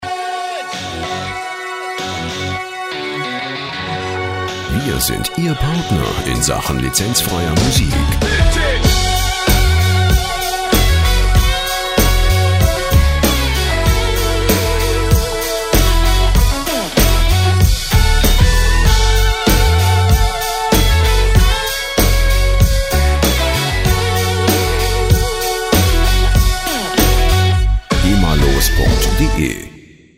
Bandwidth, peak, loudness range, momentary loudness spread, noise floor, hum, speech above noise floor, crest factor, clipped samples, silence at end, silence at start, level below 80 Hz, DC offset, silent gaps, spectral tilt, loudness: 16.5 kHz; 0 dBFS; 6 LU; 8 LU; -40 dBFS; none; 25 dB; 14 dB; under 0.1%; 0.4 s; 0 s; -16 dBFS; under 0.1%; none; -4 dB/octave; -15 LUFS